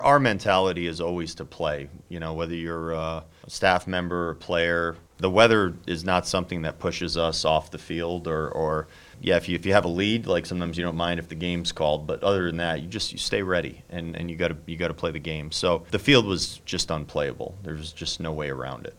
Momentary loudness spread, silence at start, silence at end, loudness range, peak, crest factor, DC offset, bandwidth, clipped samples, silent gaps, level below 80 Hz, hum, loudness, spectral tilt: 12 LU; 0 s; 0.05 s; 4 LU; -2 dBFS; 24 dB; under 0.1%; 16.5 kHz; under 0.1%; none; -46 dBFS; none; -26 LUFS; -4.5 dB/octave